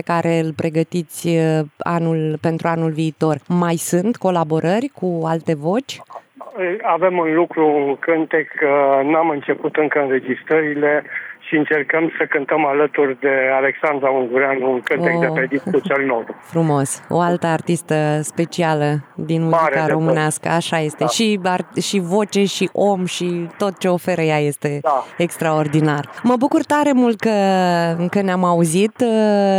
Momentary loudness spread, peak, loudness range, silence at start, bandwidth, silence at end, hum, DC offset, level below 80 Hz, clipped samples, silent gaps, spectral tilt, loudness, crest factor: 5 LU; -4 dBFS; 2 LU; 0.05 s; 16 kHz; 0 s; none; under 0.1%; -72 dBFS; under 0.1%; none; -5.5 dB/octave; -18 LUFS; 12 dB